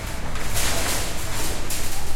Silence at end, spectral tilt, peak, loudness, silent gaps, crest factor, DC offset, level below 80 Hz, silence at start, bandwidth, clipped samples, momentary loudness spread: 0 s; -2.5 dB/octave; -8 dBFS; -26 LUFS; none; 12 dB; under 0.1%; -30 dBFS; 0 s; 16.5 kHz; under 0.1%; 6 LU